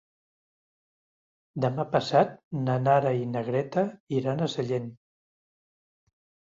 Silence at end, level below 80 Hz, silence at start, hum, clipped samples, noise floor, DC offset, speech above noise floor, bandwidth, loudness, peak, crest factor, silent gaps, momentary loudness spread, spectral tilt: 1.55 s; -68 dBFS; 1.55 s; none; under 0.1%; under -90 dBFS; under 0.1%; over 64 dB; 7.6 kHz; -27 LUFS; -10 dBFS; 20 dB; 2.44-2.51 s, 4.00-4.07 s; 8 LU; -7 dB/octave